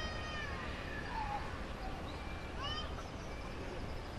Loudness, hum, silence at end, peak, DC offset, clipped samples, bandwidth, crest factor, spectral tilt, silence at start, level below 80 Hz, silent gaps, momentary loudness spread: -43 LUFS; none; 0 s; -28 dBFS; 0.1%; under 0.1%; 13 kHz; 14 dB; -5 dB/octave; 0 s; -48 dBFS; none; 5 LU